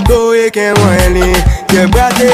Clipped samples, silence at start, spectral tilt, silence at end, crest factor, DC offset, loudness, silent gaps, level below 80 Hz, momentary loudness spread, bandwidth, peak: 0.5%; 0 s; -5 dB/octave; 0 s; 8 dB; under 0.1%; -9 LUFS; none; -16 dBFS; 2 LU; 16 kHz; 0 dBFS